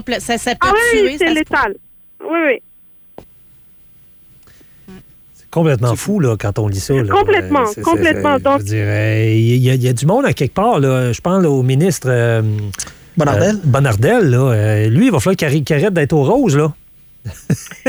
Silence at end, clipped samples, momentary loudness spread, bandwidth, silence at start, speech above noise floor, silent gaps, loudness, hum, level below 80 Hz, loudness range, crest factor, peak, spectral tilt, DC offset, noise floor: 0 s; under 0.1%; 8 LU; over 20 kHz; 0 s; 31 dB; none; -14 LUFS; none; -42 dBFS; 9 LU; 12 dB; -2 dBFS; -6 dB/octave; under 0.1%; -44 dBFS